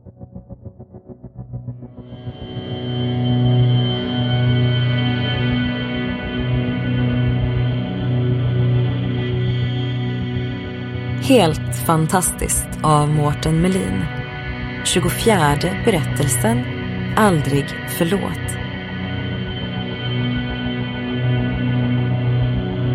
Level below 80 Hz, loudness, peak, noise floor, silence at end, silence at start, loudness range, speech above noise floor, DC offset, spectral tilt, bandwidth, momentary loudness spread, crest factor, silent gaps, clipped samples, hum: -36 dBFS; -19 LUFS; -2 dBFS; -39 dBFS; 0 s; 0.05 s; 5 LU; 22 dB; under 0.1%; -5.5 dB/octave; 16 kHz; 14 LU; 18 dB; none; under 0.1%; none